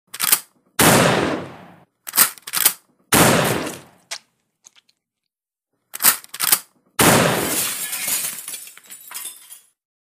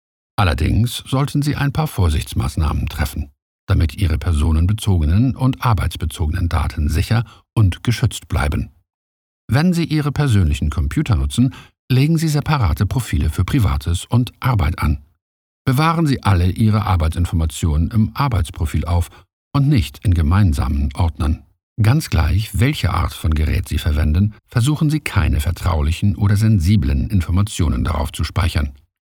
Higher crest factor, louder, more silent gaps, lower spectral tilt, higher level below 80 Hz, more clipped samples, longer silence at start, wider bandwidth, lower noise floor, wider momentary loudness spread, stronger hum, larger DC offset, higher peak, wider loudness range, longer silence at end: first, 22 dB vs 16 dB; about the same, -17 LUFS vs -18 LUFS; second, none vs 3.42-3.67 s, 8.94-9.48 s, 11.79-11.88 s, 15.21-15.65 s, 19.33-19.51 s, 21.63-21.76 s; second, -2.5 dB/octave vs -6.5 dB/octave; second, -50 dBFS vs -26 dBFS; neither; second, 0.15 s vs 0.4 s; about the same, 16 kHz vs 17.5 kHz; second, -84 dBFS vs under -90 dBFS; first, 20 LU vs 6 LU; neither; neither; about the same, 0 dBFS vs -2 dBFS; first, 5 LU vs 2 LU; first, 0.45 s vs 0.3 s